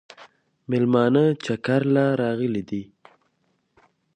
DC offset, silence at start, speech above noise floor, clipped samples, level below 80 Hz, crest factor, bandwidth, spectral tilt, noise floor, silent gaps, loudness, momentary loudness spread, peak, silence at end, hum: under 0.1%; 0.2 s; 49 dB; under 0.1%; -64 dBFS; 18 dB; 9.4 kHz; -8 dB/octave; -70 dBFS; none; -22 LUFS; 10 LU; -6 dBFS; 1.3 s; none